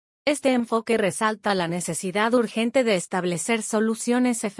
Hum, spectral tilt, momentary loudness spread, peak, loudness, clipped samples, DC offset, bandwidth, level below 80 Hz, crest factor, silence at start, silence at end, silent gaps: none; -4 dB/octave; 4 LU; -8 dBFS; -23 LUFS; under 0.1%; under 0.1%; 12 kHz; -68 dBFS; 16 dB; 0.25 s; 0.05 s; none